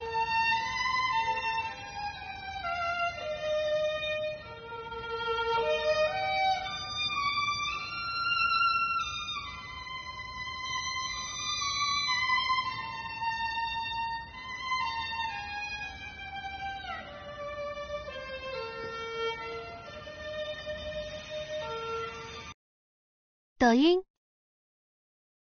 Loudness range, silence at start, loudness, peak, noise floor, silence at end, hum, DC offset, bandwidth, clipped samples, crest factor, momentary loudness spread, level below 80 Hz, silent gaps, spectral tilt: 9 LU; 0 s; -31 LUFS; -12 dBFS; under -90 dBFS; 1.5 s; none; under 0.1%; 6.6 kHz; under 0.1%; 20 dB; 13 LU; -56 dBFS; 22.54-23.56 s; -1 dB/octave